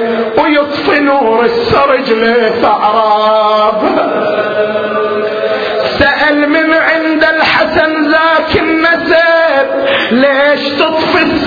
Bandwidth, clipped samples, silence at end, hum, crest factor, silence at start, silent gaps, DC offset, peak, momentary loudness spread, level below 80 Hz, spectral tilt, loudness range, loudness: 5.4 kHz; under 0.1%; 0 s; none; 10 dB; 0 s; none; under 0.1%; 0 dBFS; 5 LU; -40 dBFS; -6 dB/octave; 2 LU; -9 LUFS